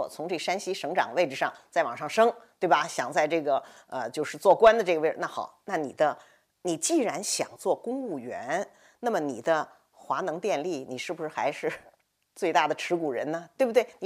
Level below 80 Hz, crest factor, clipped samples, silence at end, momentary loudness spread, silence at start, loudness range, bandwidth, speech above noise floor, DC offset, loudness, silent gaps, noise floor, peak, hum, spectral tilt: -70 dBFS; 20 dB; under 0.1%; 0 s; 10 LU; 0 s; 6 LU; 15.5 kHz; 35 dB; under 0.1%; -28 LUFS; none; -62 dBFS; -8 dBFS; none; -3.5 dB/octave